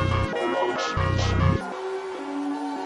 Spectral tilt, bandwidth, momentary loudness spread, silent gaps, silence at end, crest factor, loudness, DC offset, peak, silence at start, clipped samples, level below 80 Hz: -6 dB/octave; 11 kHz; 9 LU; none; 0 s; 16 dB; -26 LUFS; under 0.1%; -10 dBFS; 0 s; under 0.1%; -40 dBFS